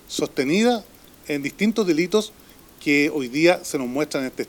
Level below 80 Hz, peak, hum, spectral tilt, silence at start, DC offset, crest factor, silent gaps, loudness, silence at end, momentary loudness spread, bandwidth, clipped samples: -58 dBFS; -2 dBFS; none; -4.5 dB/octave; 0.1 s; under 0.1%; 20 dB; none; -22 LUFS; 0.05 s; 9 LU; 19.5 kHz; under 0.1%